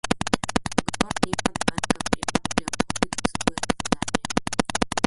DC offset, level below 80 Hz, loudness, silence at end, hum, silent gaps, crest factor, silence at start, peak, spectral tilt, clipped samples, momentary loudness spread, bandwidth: under 0.1%; -44 dBFS; -25 LUFS; 0 s; none; none; 22 dB; 0.05 s; -2 dBFS; -3.5 dB/octave; under 0.1%; 2 LU; 12 kHz